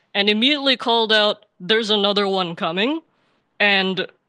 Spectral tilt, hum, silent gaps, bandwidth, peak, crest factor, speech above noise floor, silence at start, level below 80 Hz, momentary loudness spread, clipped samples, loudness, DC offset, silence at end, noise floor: -4.5 dB/octave; none; none; 10 kHz; -2 dBFS; 18 dB; 45 dB; 0.15 s; -74 dBFS; 7 LU; under 0.1%; -18 LUFS; under 0.1%; 0.25 s; -65 dBFS